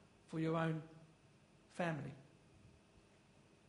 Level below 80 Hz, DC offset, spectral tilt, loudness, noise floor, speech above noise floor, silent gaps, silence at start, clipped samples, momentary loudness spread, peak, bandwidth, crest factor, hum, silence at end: -78 dBFS; under 0.1%; -7.5 dB/octave; -43 LUFS; -68 dBFS; 28 dB; none; 0.3 s; under 0.1%; 23 LU; -24 dBFS; 10.5 kHz; 22 dB; none; 1 s